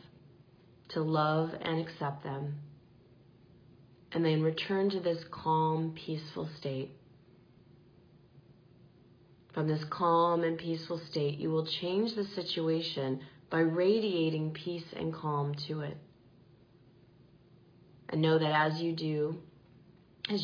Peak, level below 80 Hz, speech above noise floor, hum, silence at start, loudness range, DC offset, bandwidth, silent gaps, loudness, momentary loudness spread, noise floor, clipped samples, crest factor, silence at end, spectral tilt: -16 dBFS; -72 dBFS; 29 dB; none; 0.9 s; 8 LU; under 0.1%; 5.2 kHz; none; -33 LUFS; 11 LU; -61 dBFS; under 0.1%; 18 dB; 0 s; -5 dB/octave